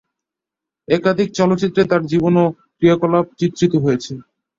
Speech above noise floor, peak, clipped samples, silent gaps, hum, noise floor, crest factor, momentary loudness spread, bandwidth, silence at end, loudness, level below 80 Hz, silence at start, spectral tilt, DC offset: 70 dB; -2 dBFS; under 0.1%; none; none; -85 dBFS; 16 dB; 6 LU; 7.6 kHz; 0.4 s; -17 LUFS; -52 dBFS; 0.9 s; -7 dB/octave; under 0.1%